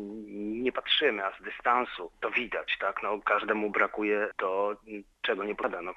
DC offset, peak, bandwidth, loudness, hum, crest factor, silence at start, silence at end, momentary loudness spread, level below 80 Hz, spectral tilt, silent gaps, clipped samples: under 0.1%; -10 dBFS; 7.4 kHz; -30 LUFS; none; 22 dB; 0 s; 0 s; 10 LU; -64 dBFS; -5 dB/octave; none; under 0.1%